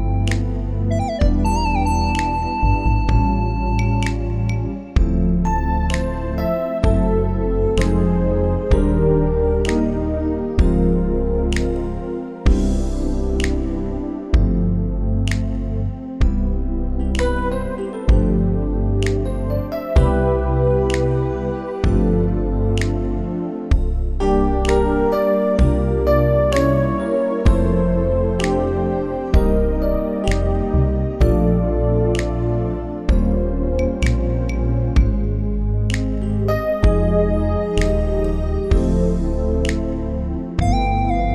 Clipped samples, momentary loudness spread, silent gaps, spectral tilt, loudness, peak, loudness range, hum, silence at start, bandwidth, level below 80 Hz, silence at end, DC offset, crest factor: under 0.1%; 6 LU; none; -7.5 dB/octave; -20 LUFS; -4 dBFS; 4 LU; none; 0 s; 11.5 kHz; -20 dBFS; 0 s; under 0.1%; 14 dB